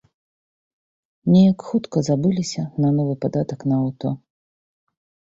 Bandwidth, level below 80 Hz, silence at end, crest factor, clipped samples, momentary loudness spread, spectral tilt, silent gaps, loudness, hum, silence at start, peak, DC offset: 7.8 kHz; -58 dBFS; 1.05 s; 16 dB; under 0.1%; 12 LU; -7.5 dB/octave; none; -20 LUFS; none; 1.25 s; -6 dBFS; under 0.1%